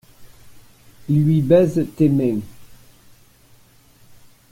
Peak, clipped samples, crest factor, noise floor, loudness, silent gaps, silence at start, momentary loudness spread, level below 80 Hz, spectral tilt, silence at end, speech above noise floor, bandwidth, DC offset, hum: -2 dBFS; under 0.1%; 18 dB; -51 dBFS; -18 LUFS; none; 0.2 s; 17 LU; -52 dBFS; -9 dB/octave; 1.75 s; 35 dB; 16 kHz; under 0.1%; none